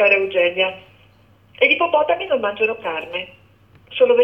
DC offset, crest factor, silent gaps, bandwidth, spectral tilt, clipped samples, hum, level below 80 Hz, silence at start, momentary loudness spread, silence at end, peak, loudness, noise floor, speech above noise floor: under 0.1%; 16 dB; none; 5.6 kHz; -5.5 dB/octave; under 0.1%; none; -64 dBFS; 0 s; 14 LU; 0 s; -2 dBFS; -18 LUFS; -52 dBFS; 34 dB